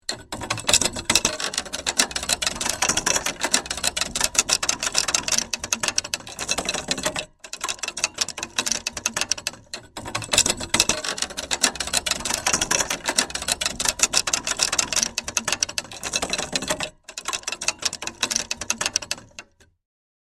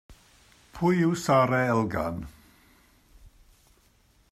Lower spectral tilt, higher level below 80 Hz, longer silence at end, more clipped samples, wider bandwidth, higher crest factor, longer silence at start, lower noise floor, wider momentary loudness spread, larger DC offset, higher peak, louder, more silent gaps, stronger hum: second, 0 dB/octave vs -6.5 dB/octave; first, -48 dBFS vs -54 dBFS; second, 0.8 s vs 1.05 s; neither; first, 16 kHz vs 14 kHz; about the same, 24 dB vs 20 dB; about the same, 0.1 s vs 0.1 s; second, -46 dBFS vs -63 dBFS; second, 10 LU vs 13 LU; neither; first, 0 dBFS vs -8 dBFS; first, -22 LUFS vs -25 LUFS; neither; neither